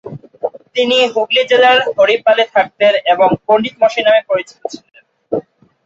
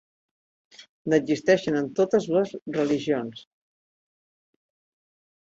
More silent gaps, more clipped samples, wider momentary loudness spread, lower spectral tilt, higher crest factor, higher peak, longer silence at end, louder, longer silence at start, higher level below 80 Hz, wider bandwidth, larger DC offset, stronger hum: second, none vs 0.89-1.05 s, 2.62-2.66 s; neither; first, 15 LU vs 7 LU; second, -4 dB/octave vs -6 dB/octave; second, 12 dB vs 20 dB; first, -2 dBFS vs -6 dBFS; second, 0.45 s vs 2.1 s; first, -12 LUFS vs -24 LUFS; second, 0.05 s vs 0.8 s; first, -58 dBFS vs -68 dBFS; about the same, 7.8 kHz vs 8 kHz; neither; neither